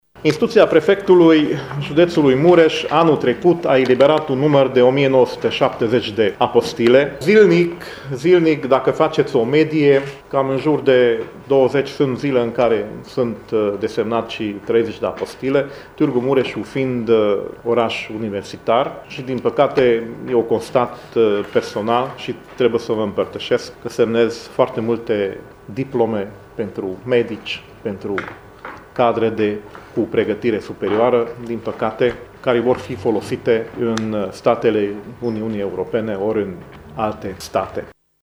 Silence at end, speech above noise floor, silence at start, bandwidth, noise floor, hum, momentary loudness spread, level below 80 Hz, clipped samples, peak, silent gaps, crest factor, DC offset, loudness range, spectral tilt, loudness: 0.3 s; 19 dB; 0.15 s; 12.5 kHz; -36 dBFS; none; 12 LU; -52 dBFS; under 0.1%; 0 dBFS; none; 18 dB; under 0.1%; 7 LU; -6.5 dB/octave; -17 LUFS